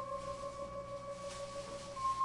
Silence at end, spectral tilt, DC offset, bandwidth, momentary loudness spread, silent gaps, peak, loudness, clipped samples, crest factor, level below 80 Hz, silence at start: 0 s; -4 dB/octave; under 0.1%; 11.5 kHz; 6 LU; none; -28 dBFS; -44 LUFS; under 0.1%; 14 dB; -60 dBFS; 0 s